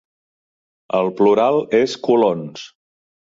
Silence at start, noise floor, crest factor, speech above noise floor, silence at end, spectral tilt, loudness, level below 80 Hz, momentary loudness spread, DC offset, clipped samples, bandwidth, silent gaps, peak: 0.95 s; under -90 dBFS; 16 dB; over 74 dB; 0.6 s; -6 dB/octave; -17 LUFS; -66 dBFS; 13 LU; under 0.1%; under 0.1%; 7.6 kHz; none; -4 dBFS